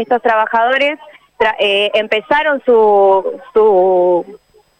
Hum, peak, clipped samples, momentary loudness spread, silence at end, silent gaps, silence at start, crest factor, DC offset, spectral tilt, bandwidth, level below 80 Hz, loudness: none; -2 dBFS; under 0.1%; 7 LU; 0.45 s; none; 0 s; 10 dB; under 0.1%; -5 dB/octave; 9.2 kHz; -54 dBFS; -13 LUFS